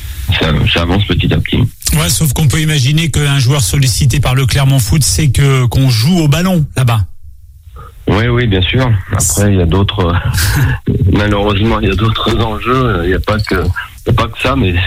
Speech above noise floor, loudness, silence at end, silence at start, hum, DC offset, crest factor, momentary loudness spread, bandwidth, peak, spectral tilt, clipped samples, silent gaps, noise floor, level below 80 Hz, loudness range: 23 dB; -12 LUFS; 0 s; 0 s; none; under 0.1%; 10 dB; 4 LU; 16.5 kHz; 0 dBFS; -5 dB/octave; under 0.1%; none; -33 dBFS; -24 dBFS; 3 LU